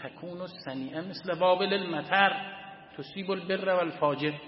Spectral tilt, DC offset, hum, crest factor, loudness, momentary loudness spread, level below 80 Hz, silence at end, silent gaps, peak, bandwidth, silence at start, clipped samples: -9 dB/octave; under 0.1%; none; 22 dB; -29 LUFS; 16 LU; -74 dBFS; 0 s; none; -6 dBFS; 5.8 kHz; 0 s; under 0.1%